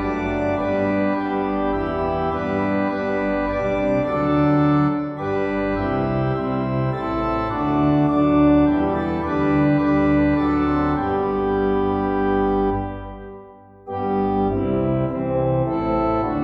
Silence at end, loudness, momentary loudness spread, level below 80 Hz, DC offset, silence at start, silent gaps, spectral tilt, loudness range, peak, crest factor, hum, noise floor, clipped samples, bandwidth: 0 s; -20 LUFS; 6 LU; -38 dBFS; under 0.1%; 0 s; none; -9.5 dB/octave; 4 LU; -6 dBFS; 14 dB; none; -43 dBFS; under 0.1%; 5.6 kHz